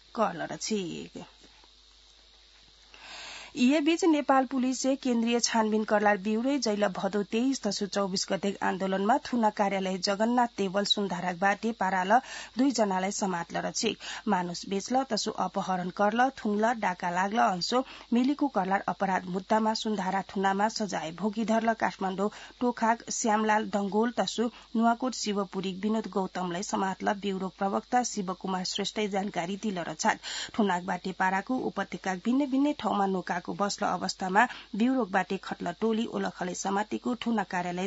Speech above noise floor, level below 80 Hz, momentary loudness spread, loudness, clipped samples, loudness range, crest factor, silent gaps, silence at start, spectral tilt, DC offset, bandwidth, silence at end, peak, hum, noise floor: 29 dB; -66 dBFS; 7 LU; -29 LUFS; under 0.1%; 3 LU; 20 dB; none; 0.15 s; -4 dB/octave; under 0.1%; 8 kHz; 0 s; -10 dBFS; none; -58 dBFS